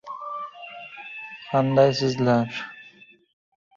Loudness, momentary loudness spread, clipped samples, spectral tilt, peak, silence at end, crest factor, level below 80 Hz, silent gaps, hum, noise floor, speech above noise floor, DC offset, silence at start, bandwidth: -23 LUFS; 19 LU; under 0.1%; -6.5 dB/octave; -4 dBFS; 0.95 s; 20 dB; -64 dBFS; none; none; -52 dBFS; 31 dB; under 0.1%; 0.05 s; 7.6 kHz